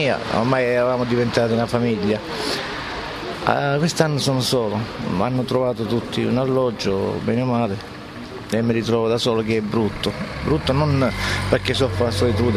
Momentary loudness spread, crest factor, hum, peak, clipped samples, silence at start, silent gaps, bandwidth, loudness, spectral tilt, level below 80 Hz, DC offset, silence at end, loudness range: 7 LU; 18 dB; none; -2 dBFS; under 0.1%; 0 s; none; 13.5 kHz; -21 LUFS; -5.5 dB/octave; -42 dBFS; under 0.1%; 0 s; 2 LU